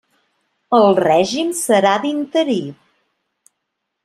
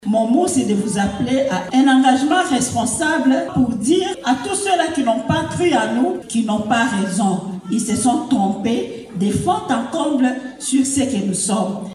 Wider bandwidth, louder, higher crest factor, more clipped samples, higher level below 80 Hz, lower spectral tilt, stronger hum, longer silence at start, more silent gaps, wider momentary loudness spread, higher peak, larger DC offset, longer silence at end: about the same, 15 kHz vs 14 kHz; about the same, -16 LUFS vs -18 LUFS; about the same, 16 dB vs 16 dB; neither; second, -62 dBFS vs -50 dBFS; about the same, -4 dB/octave vs -4.5 dB/octave; neither; first, 0.7 s vs 0 s; neither; first, 8 LU vs 5 LU; about the same, -2 dBFS vs -2 dBFS; neither; first, 1.3 s vs 0 s